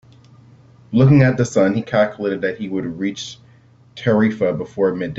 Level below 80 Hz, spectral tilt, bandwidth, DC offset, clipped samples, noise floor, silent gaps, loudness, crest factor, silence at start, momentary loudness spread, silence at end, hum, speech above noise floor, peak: -52 dBFS; -7 dB/octave; 8 kHz; under 0.1%; under 0.1%; -49 dBFS; none; -18 LUFS; 18 dB; 0.9 s; 12 LU; 0 s; none; 32 dB; 0 dBFS